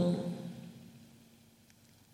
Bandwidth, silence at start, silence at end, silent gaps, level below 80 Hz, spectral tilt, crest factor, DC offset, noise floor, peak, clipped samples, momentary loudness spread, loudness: 15 kHz; 0 s; 0.9 s; none; -74 dBFS; -8 dB/octave; 20 dB; under 0.1%; -63 dBFS; -20 dBFS; under 0.1%; 25 LU; -39 LUFS